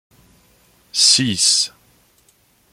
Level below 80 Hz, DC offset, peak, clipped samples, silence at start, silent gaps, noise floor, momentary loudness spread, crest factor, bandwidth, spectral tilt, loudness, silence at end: -60 dBFS; under 0.1%; 0 dBFS; under 0.1%; 0.95 s; none; -57 dBFS; 12 LU; 20 dB; 16.5 kHz; -1 dB/octave; -14 LUFS; 1.05 s